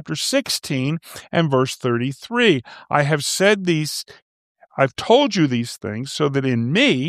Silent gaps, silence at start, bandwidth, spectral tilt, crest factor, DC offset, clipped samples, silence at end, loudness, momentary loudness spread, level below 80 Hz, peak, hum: 4.22-4.55 s; 0.05 s; 15.5 kHz; -4.5 dB/octave; 18 dB; under 0.1%; under 0.1%; 0 s; -19 LUFS; 10 LU; -62 dBFS; -2 dBFS; none